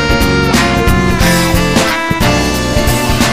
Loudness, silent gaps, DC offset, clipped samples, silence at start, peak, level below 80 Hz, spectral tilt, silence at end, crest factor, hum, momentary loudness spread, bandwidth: -11 LUFS; none; 2%; under 0.1%; 0 s; 0 dBFS; -18 dBFS; -4.5 dB/octave; 0 s; 10 dB; none; 2 LU; 15.5 kHz